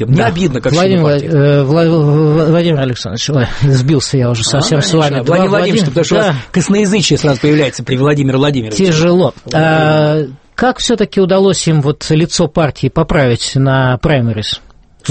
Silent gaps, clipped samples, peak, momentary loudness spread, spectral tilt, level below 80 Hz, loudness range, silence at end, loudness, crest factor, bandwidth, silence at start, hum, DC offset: none; under 0.1%; 0 dBFS; 5 LU; -5.5 dB/octave; -34 dBFS; 1 LU; 0 s; -11 LUFS; 10 dB; 8.8 kHz; 0 s; none; under 0.1%